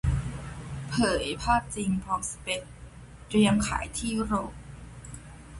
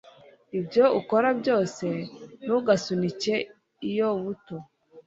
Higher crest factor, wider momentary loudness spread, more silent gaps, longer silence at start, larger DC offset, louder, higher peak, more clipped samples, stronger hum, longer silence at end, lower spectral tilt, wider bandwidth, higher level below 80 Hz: about the same, 18 dB vs 20 dB; first, 21 LU vs 16 LU; neither; second, 0.05 s vs 0.55 s; neither; about the same, -28 LUFS vs -26 LUFS; second, -12 dBFS vs -6 dBFS; neither; neither; about the same, 0 s vs 0.05 s; about the same, -5 dB/octave vs -5.5 dB/octave; first, 11.5 kHz vs 8 kHz; first, -40 dBFS vs -68 dBFS